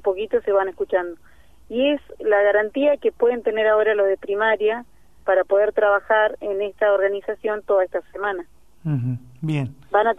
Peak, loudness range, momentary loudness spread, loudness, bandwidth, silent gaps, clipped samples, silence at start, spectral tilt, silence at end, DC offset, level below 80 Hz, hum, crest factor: -6 dBFS; 4 LU; 9 LU; -21 LUFS; 3.9 kHz; none; under 0.1%; 0.05 s; -7.5 dB/octave; 0.05 s; 0.4%; -56 dBFS; none; 16 dB